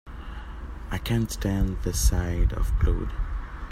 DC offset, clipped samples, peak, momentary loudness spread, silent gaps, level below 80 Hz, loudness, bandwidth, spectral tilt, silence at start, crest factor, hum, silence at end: under 0.1%; under 0.1%; -8 dBFS; 15 LU; none; -28 dBFS; -27 LUFS; 16 kHz; -5.5 dB/octave; 0.05 s; 16 dB; none; 0 s